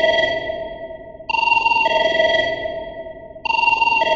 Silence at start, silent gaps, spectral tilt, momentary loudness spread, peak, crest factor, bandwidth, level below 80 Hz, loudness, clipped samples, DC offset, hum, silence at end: 0 s; none; -3 dB/octave; 18 LU; -4 dBFS; 16 dB; 7.6 kHz; -48 dBFS; -17 LUFS; under 0.1%; under 0.1%; none; 0 s